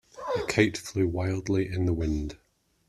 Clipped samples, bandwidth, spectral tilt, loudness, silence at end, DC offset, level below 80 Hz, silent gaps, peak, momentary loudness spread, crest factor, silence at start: under 0.1%; 13 kHz; -6 dB/octave; -28 LUFS; 0.55 s; under 0.1%; -44 dBFS; none; -6 dBFS; 8 LU; 22 dB; 0.15 s